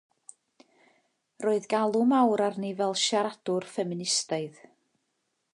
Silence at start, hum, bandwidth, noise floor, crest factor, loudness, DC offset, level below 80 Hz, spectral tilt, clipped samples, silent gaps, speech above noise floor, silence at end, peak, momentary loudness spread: 1.4 s; none; 11.5 kHz; -78 dBFS; 18 dB; -27 LUFS; under 0.1%; -82 dBFS; -3.5 dB/octave; under 0.1%; none; 51 dB; 1.05 s; -12 dBFS; 10 LU